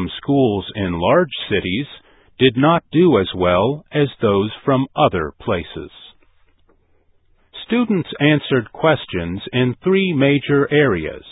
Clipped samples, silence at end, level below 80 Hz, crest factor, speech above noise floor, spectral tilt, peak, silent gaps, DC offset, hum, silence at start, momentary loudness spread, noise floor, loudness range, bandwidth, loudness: under 0.1%; 0.1 s; -42 dBFS; 18 dB; 40 dB; -12 dB/octave; 0 dBFS; none; under 0.1%; none; 0 s; 9 LU; -57 dBFS; 6 LU; 4 kHz; -17 LUFS